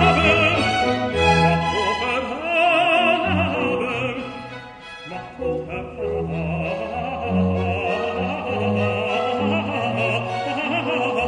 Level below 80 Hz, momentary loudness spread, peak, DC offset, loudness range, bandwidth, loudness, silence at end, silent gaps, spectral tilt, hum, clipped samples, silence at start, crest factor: -42 dBFS; 13 LU; -2 dBFS; under 0.1%; 8 LU; 10 kHz; -21 LUFS; 0 s; none; -5.5 dB/octave; none; under 0.1%; 0 s; 18 dB